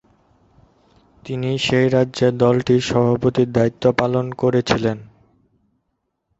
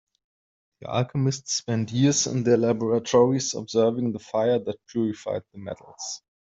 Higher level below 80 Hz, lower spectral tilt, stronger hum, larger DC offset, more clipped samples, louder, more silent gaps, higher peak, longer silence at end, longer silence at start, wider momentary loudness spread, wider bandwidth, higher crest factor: first, -48 dBFS vs -64 dBFS; first, -6.5 dB/octave vs -5 dB/octave; neither; neither; neither; first, -18 LUFS vs -24 LUFS; neither; first, -2 dBFS vs -6 dBFS; first, 1.35 s vs 0.3 s; first, 1.25 s vs 0.8 s; second, 7 LU vs 14 LU; about the same, 8 kHz vs 8.2 kHz; about the same, 18 dB vs 18 dB